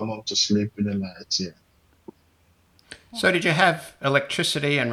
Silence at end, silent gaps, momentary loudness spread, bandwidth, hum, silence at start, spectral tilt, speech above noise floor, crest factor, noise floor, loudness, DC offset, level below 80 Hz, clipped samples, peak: 0 s; none; 8 LU; 14.5 kHz; none; 0 s; -3.5 dB/octave; 38 dB; 22 dB; -61 dBFS; -23 LUFS; under 0.1%; -64 dBFS; under 0.1%; -2 dBFS